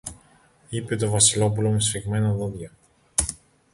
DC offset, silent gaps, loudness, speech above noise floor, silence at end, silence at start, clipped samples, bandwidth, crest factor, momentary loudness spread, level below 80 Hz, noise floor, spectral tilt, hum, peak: under 0.1%; none; -23 LUFS; 34 dB; 0.4 s; 0.05 s; under 0.1%; 12 kHz; 20 dB; 17 LU; -46 dBFS; -57 dBFS; -4 dB/octave; none; -4 dBFS